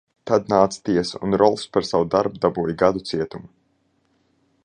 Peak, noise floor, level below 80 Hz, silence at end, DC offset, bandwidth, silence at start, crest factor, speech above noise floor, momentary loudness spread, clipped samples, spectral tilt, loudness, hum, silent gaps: -2 dBFS; -66 dBFS; -52 dBFS; 1.2 s; under 0.1%; 10.5 kHz; 0.25 s; 20 dB; 46 dB; 8 LU; under 0.1%; -6 dB/octave; -21 LUFS; none; none